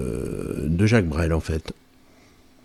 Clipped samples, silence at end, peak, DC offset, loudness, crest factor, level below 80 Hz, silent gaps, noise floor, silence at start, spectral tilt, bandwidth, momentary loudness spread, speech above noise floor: under 0.1%; 0.9 s; -6 dBFS; under 0.1%; -23 LUFS; 18 dB; -36 dBFS; none; -53 dBFS; 0 s; -7 dB/octave; 13 kHz; 14 LU; 32 dB